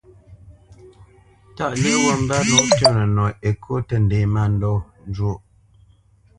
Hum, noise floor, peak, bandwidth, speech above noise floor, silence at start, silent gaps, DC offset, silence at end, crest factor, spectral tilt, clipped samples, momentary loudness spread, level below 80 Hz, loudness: none; -54 dBFS; 0 dBFS; 11 kHz; 35 dB; 0.3 s; none; under 0.1%; 1 s; 20 dB; -4.5 dB/octave; under 0.1%; 11 LU; -40 dBFS; -19 LUFS